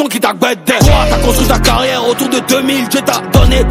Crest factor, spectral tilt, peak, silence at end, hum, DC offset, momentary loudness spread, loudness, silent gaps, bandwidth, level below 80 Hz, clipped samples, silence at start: 10 dB; -4.5 dB/octave; 0 dBFS; 0 s; none; under 0.1%; 4 LU; -11 LUFS; none; 16.5 kHz; -16 dBFS; 1%; 0 s